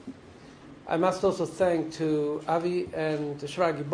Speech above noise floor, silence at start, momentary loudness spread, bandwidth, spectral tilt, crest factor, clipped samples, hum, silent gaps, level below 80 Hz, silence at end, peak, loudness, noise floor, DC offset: 22 dB; 0 s; 16 LU; 10.5 kHz; -6 dB/octave; 18 dB; under 0.1%; none; none; -62 dBFS; 0 s; -10 dBFS; -28 LUFS; -49 dBFS; under 0.1%